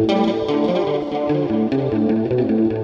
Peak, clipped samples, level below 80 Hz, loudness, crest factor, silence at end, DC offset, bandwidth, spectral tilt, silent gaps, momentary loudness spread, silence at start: -6 dBFS; under 0.1%; -50 dBFS; -19 LUFS; 14 dB; 0 s; under 0.1%; 7.2 kHz; -8 dB/octave; none; 3 LU; 0 s